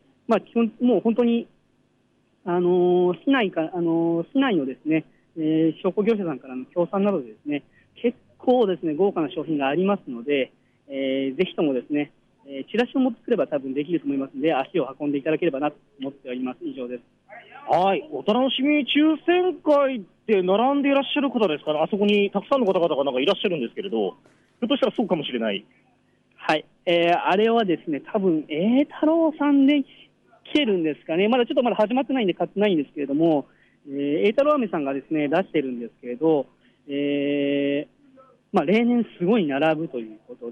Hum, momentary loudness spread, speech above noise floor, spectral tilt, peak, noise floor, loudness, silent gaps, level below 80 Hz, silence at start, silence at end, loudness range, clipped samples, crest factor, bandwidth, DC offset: none; 11 LU; 42 dB; -7.5 dB/octave; -8 dBFS; -65 dBFS; -23 LUFS; none; -70 dBFS; 0.3 s; 0 s; 5 LU; under 0.1%; 16 dB; 6.8 kHz; under 0.1%